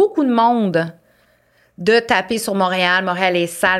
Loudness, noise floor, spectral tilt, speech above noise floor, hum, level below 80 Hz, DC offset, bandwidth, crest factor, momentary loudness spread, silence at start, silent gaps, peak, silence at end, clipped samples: -16 LUFS; -57 dBFS; -4.5 dB/octave; 41 dB; none; -56 dBFS; under 0.1%; 15.5 kHz; 16 dB; 6 LU; 0 s; none; -2 dBFS; 0 s; under 0.1%